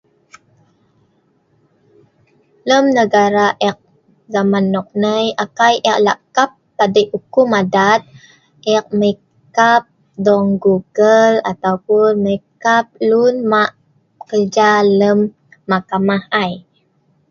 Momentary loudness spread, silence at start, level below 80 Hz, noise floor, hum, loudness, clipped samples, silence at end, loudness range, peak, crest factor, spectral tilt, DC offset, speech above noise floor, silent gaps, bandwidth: 8 LU; 2.65 s; -58 dBFS; -59 dBFS; none; -14 LUFS; under 0.1%; 0.7 s; 3 LU; 0 dBFS; 16 dB; -5 dB/octave; under 0.1%; 45 dB; none; 7.2 kHz